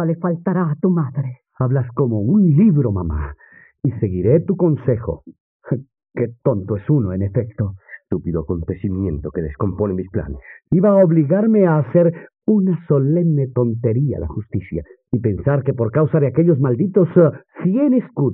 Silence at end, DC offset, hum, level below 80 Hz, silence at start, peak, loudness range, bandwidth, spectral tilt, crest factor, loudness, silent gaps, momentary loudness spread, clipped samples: 0 s; under 0.1%; none; -40 dBFS; 0 s; -2 dBFS; 6 LU; 3 kHz; -14 dB/octave; 16 dB; -18 LUFS; 5.40-5.60 s; 12 LU; under 0.1%